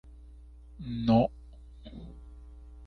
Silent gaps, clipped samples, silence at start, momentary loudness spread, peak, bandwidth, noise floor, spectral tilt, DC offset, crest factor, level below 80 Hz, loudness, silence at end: none; under 0.1%; 0.05 s; 27 LU; -12 dBFS; 6 kHz; -50 dBFS; -9.5 dB/octave; under 0.1%; 20 dB; -48 dBFS; -28 LUFS; 0 s